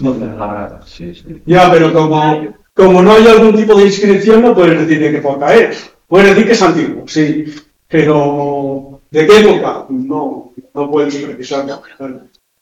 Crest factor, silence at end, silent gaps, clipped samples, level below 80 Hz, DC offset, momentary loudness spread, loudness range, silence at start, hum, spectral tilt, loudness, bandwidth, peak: 10 dB; 0.45 s; none; 4%; -42 dBFS; under 0.1%; 21 LU; 6 LU; 0 s; none; -6 dB/octave; -9 LUFS; 11.5 kHz; 0 dBFS